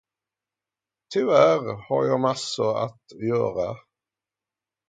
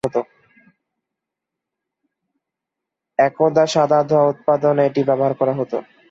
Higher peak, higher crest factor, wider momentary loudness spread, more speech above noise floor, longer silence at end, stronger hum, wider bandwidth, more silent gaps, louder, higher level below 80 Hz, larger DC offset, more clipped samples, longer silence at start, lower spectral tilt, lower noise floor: about the same, -4 dBFS vs -2 dBFS; first, 22 dB vs 16 dB; first, 14 LU vs 10 LU; about the same, 67 dB vs 66 dB; first, 1.1 s vs 0.3 s; neither; first, 9.4 kHz vs 8.2 kHz; neither; second, -23 LUFS vs -18 LUFS; about the same, -64 dBFS vs -64 dBFS; neither; neither; first, 1.1 s vs 0.05 s; about the same, -5.5 dB/octave vs -6 dB/octave; first, -90 dBFS vs -83 dBFS